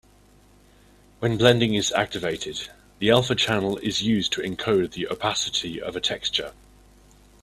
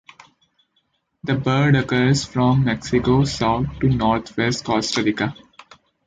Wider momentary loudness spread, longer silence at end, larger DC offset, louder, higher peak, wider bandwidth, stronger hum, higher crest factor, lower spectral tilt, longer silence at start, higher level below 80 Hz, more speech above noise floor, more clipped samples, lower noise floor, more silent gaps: first, 10 LU vs 5 LU; first, 0.9 s vs 0.75 s; neither; second, -23 LUFS vs -19 LUFS; about the same, -2 dBFS vs -4 dBFS; first, 14 kHz vs 9.4 kHz; first, 50 Hz at -50 dBFS vs none; first, 24 dB vs 16 dB; second, -4 dB/octave vs -6 dB/octave; about the same, 1.2 s vs 1.25 s; second, -52 dBFS vs -42 dBFS; second, 31 dB vs 50 dB; neither; second, -55 dBFS vs -68 dBFS; neither